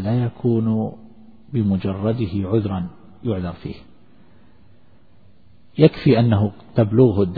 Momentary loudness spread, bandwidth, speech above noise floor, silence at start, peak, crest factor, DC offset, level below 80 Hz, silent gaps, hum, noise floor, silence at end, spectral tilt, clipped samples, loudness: 15 LU; 4.9 kHz; 36 dB; 0 s; 0 dBFS; 20 dB; 0.5%; -48 dBFS; none; none; -54 dBFS; 0 s; -11.5 dB/octave; under 0.1%; -20 LUFS